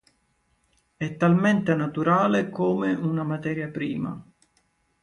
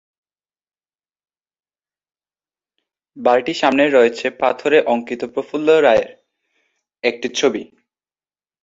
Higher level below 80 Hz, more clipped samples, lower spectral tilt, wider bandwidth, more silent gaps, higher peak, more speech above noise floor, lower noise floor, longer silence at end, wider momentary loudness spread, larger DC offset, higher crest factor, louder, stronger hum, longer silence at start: about the same, -62 dBFS vs -62 dBFS; neither; first, -8 dB/octave vs -4 dB/octave; first, 9.8 kHz vs 7.8 kHz; neither; second, -8 dBFS vs -2 dBFS; second, 45 dB vs over 74 dB; second, -69 dBFS vs under -90 dBFS; second, 0.8 s vs 1 s; about the same, 12 LU vs 11 LU; neither; about the same, 18 dB vs 18 dB; second, -24 LUFS vs -17 LUFS; neither; second, 1 s vs 3.15 s